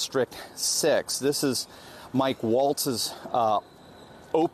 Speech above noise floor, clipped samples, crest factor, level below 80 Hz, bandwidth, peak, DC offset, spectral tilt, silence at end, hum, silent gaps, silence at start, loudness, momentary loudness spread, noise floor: 22 dB; under 0.1%; 16 dB; -66 dBFS; 13.5 kHz; -10 dBFS; under 0.1%; -3 dB/octave; 0.05 s; none; none; 0 s; -26 LUFS; 7 LU; -48 dBFS